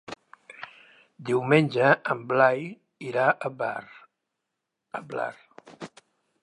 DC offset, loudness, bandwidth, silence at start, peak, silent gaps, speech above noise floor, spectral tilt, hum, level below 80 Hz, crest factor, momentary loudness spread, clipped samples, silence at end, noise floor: under 0.1%; -25 LUFS; 11.5 kHz; 0.1 s; -4 dBFS; none; 59 dB; -7 dB/octave; none; -76 dBFS; 24 dB; 22 LU; under 0.1%; 0.55 s; -83 dBFS